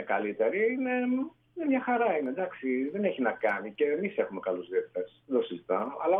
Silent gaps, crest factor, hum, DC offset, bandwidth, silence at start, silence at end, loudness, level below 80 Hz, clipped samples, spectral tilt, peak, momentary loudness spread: none; 16 dB; none; under 0.1%; 3.8 kHz; 0 s; 0 s; -30 LUFS; -76 dBFS; under 0.1%; -8.5 dB/octave; -14 dBFS; 6 LU